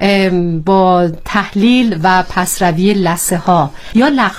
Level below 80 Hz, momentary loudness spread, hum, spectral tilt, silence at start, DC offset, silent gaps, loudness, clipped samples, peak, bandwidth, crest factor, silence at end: -34 dBFS; 5 LU; none; -5 dB/octave; 0 s; under 0.1%; none; -12 LUFS; under 0.1%; 0 dBFS; 16.5 kHz; 12 dB; 0 s